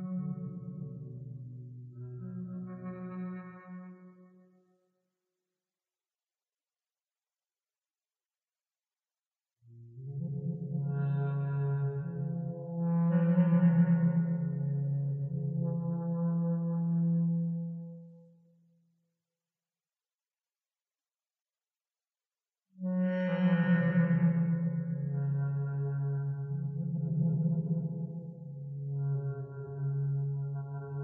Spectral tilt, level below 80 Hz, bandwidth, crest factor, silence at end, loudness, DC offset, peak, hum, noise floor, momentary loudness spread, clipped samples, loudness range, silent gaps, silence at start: -10 dB/octave; -76 dBFS; 3.3 kHz; 18 dB; 0 s; -32 LUFS; under 0.1%; -16 dBFS; none; under -90 dBFS; 17 LU; under 0.1%; 15 LU; 9.27-9.31 s; 0 s